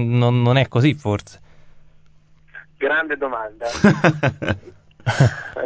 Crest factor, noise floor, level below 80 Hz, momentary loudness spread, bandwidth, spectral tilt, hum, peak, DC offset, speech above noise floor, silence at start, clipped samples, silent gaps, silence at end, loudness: 20 dB; -51 dBFS; -44 dBFS; 11 LU; 8 kHz; -7 dB/octave; none; 0 dBFS; 0.2%; 33 dB; 0 s; under 0.1%; none; 0 s; -19 LUFS